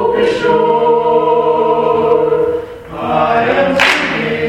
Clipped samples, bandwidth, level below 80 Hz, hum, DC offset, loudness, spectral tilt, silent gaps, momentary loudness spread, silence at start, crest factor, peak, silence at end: under 0.1%; 11.5 kHz; -44 dBFS; none; under 0.1%; -12 LUFS; -5 dB/octave; none; 7 LU; 0 s; 12 dB; 0 dBFS; 0 s